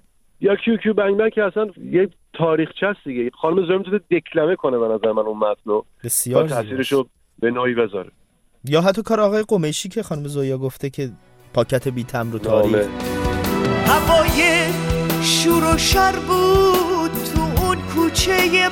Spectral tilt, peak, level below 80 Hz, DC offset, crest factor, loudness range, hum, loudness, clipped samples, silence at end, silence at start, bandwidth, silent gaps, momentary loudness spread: -4.5 dB/octave; -2 dBFS; -36 dBFS; under 0.1%; 18 dB; 5 LU; none; -19 LUFS; under 0.1%; 0 s; 0.4 s; 17 kHz; none; 10 LU